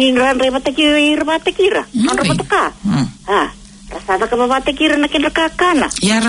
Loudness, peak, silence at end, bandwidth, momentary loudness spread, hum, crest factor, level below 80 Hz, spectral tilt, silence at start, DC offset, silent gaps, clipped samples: -14 LUFS; -2 dBFS; 0 s; 11 kHz; 5 LU; none; 12 dB; -40 dBFS; -4 dB/octave; 0 s; under 0.1%; none; under 0.1%